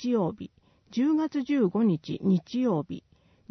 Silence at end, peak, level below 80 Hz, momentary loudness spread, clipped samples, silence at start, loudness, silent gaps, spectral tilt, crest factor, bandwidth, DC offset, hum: 0.5 s; -14 dBFS; -66 dBFS; 15 LU; under 0.1%; 0 s; -27 LUFS; none; -8 dB/octave; 14 dB; 6.4 kHz; under 0.1%; none